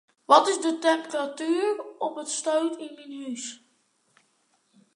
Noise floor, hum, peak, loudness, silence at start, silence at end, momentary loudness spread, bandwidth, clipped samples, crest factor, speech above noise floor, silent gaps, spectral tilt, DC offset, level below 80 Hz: -69 dBFS; none; -4 dBFS; -25 LUFS; 0.3 s; 1.4 s; 18 LU; 11 kHz; under 0.1%; 24 dB; 44 dB; none; -1.5 dB/octave; under 0.1%; -88 dBFS